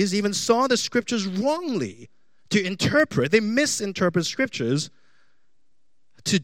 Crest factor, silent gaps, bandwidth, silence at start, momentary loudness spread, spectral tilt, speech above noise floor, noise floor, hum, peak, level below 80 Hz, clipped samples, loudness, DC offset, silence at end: 20 dB; none; 16.5 kHz; 0 s; 7 LU; -4 dB/octave; 54 dB; -77 dBFS; none; -4 dBFS; -66 dBFS; under 0.1%; -23 LUFS; 0.3%; 0 s